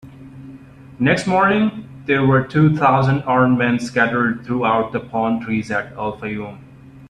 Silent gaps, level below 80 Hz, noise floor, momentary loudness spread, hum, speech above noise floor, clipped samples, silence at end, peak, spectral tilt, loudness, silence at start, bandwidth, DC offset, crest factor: none; -50 dBFS; -40 dBFS; 12 LU; none; 23 dB; under 0.1%; 0.05 s; -2 dBFS; -7 dB/octave; -18 LUFS; 0.05 s; 9.8 kHz; under 0.1%; 16 dB